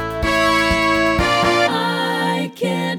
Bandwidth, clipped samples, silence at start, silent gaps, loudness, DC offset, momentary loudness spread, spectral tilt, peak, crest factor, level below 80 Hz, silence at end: 19 kHz; under 0.1%; 0 s; none; -17 LUFS; under 0.1%; 6 LU; -4.5 dB/octave; -2 dBFS; 14 dB; -34 dBFS; 0 s